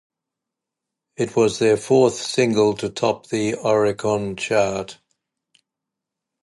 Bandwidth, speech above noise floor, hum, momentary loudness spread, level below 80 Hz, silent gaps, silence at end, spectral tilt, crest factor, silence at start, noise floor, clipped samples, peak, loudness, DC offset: 11.5 kHz; 65 dB; none; 7 LU; -58 dBFS; none; 1.5 s; -5 dB/octave; 16 dB; 1.2 s; -84 dBFS; under 0.1%; -4 dBFS; -20 LUFS; under 0.1%